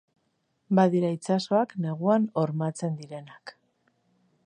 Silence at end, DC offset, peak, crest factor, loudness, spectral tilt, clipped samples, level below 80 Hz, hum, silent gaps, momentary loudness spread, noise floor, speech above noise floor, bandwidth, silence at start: 0.95 s; under 0.1%; -8 dBFS; 20 dB; -26 LUFS; -7 dB/octave; under 0.1%; -78 dBFS; none; none; 19 LU; -74 dBFS; 48 dB; 10 kHz; 0.7 s